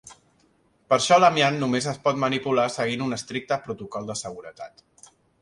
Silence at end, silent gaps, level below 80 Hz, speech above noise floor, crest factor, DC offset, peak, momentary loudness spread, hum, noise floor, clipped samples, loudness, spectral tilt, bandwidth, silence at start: 0.75 s; none; -64 dBFS; 40 dB; 22 dB; under 0.1%; -4 dBFS; 20 LU; none; -63 dBFS; under 0.1%; -23 LUFS; -4 dB/octave; 11.5 kHz; 0.05 s